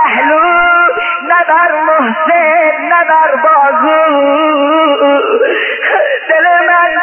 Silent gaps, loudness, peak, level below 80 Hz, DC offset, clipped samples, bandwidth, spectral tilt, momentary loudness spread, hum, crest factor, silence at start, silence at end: none; -8 LUFS; 0 dBFS; -52 dBFS; under 0.1%; under 0.1%; 3.3 kHz; -6 dB/octave; 3 LU; none; 8 dB; 0 s; 0 s